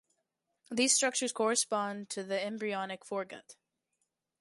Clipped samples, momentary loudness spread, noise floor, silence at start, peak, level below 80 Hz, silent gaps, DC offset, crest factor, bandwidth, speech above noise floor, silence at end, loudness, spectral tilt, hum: under 0.1%; 13 LU; -83 dBFS; 0.7 s; -14 dBFS; -84 dBFS; none; under 0.1%; 22 dB; 11.5 kHz; 50 dB; 0.9 s; -32 LUFS; -1.5 dB/octave; none